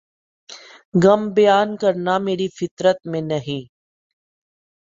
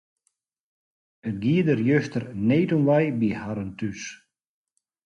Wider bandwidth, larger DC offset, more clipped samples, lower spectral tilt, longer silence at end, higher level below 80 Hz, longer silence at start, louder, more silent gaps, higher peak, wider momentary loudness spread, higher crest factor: second, 7.8 kHz vs 9.4 kHz; neither; neither; about the same, -6.5 dB/octave vs -7.5 dB/octave; first, 1.25 s vs 0.9 s; about the same, -62 dBFS vs -58 dBFS; second, 0.5 s vs 1.25 s; first, -19 LUFS vs -24 LUFS; first, 0.85-0.92 s, 2.71-2.77 s vs none; first, -2 dBFS vs -10 dBFS; about the same, 15 LU vs 13 LU; about the same, 18 dB vs 16 dB